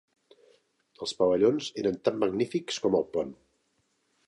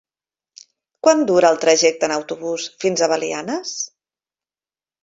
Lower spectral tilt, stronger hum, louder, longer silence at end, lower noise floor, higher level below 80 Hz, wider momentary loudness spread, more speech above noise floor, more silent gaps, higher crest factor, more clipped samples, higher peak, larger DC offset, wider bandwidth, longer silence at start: first, -5 dB/octave vs -2.5 dB/octave; neither; second, -28 LUFS vs -18 LUFS; second, 0.95 s vs 1.15 s; second, -74 dBFS vs under -90 dBFS; about the same, -66 dBFS vs -66 dBFS; about the same, 11 LU vs 11 LU; second, 46 dB vs over 72 dB; neither; about the same, 20 dB vs 20 dB; neither; second, -10 dBFS vs 0 dBFS; neither; first, 11.5 kHz vs 8 kHz; about the same, 1 s vs 1.05 s